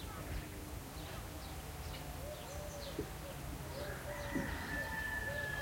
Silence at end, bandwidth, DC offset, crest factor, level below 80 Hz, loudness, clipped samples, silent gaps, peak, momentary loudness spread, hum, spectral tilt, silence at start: 0 s; 16.5 kHz; under 0.1%; 18 dB; -50 dBFS; -44 LUFS; under 0.1%; none; -26 dBFS; 8 LU; none; -4.5 dB/octave; 0 s